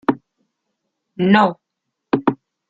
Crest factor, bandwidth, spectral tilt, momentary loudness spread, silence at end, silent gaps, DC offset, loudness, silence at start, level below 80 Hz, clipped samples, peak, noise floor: 20 dB; 7.6 kHz; -8 dB/octave; 9 LU; 0.35 s; none; under 0.1%; -18 LUFS; 0.1 s; -58 dBFS; under 0.1%; 0 dBFS; -78 dBFS